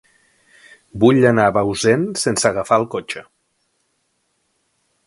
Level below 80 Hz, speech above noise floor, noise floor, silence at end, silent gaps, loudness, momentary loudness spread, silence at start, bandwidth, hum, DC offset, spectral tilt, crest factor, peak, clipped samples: -52 dBFS; 52 dB; -68 dBFS; 1.85 s; none; -16 LUFS; 15 LU; 0.95 s; 11.5 kHz; none; under 0.1%; -5 dB/octave; 20 dB; 0 dBFS; under 0.1%